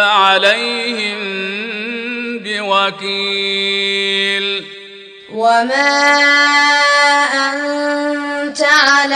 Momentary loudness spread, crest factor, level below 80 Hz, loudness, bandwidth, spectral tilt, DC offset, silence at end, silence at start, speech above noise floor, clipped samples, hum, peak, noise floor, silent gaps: 12 LU; 14 dB; -66 dBFS; -13 LUFS; 14.5 kHz; -1.5 dB/octave; under 0.1%; 0 s; 0 s; 22 dB; under 0.1%; none; 0 dBFS; -36 dBFS; none